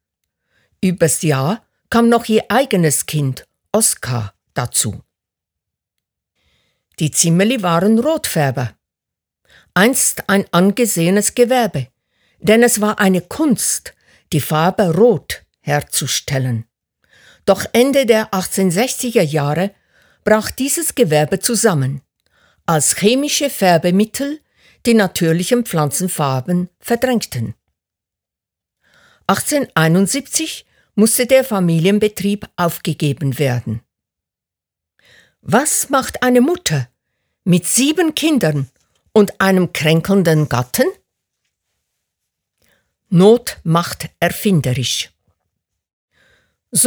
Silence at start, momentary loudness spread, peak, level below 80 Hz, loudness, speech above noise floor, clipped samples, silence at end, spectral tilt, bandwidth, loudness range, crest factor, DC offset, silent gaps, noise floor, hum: 0.8 s; 10 LU; 0 dBFS; -52 dBFS; -15 LUFS; 71 dB; under 0.1%; 0 s; -4.5 dB/octave; over 20 kHz; 5 LU; 16 dB; under 0.1%; 45.93-46.08 s; -86 dBFS; none